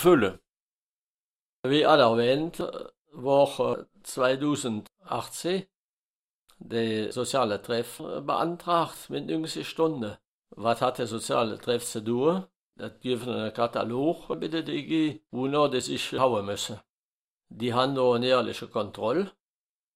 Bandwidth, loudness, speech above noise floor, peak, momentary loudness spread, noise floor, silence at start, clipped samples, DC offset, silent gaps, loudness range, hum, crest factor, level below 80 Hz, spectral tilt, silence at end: 16 kHz; -27 LUFS; over 63 dB; -6 dBFS; 12 LU; under -90 dBFS; 0 s; under 0.1%; under 0.1%; 0.57-1.63 s, 2.98-3.05 s, 5.75-6.47 s, 10.27-10.42 s, 12.56-12.70 s, 16.89-17.38 s; 5 LU; none; 22 dB; -64 dBFS; -5 dB/octave; 0.65 s